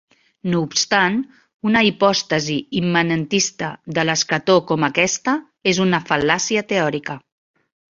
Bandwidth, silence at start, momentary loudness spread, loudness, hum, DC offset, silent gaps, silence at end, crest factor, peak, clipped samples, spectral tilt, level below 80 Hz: 7.6 kHz; 0.45 s; 9 LU; -18 LUFS; none; under 0.1%; 1.54-1.60 s; 0.75 s; 18 dB; -2 dBFS; under 0.1%; -3.5 dB/octave; -56 dBFS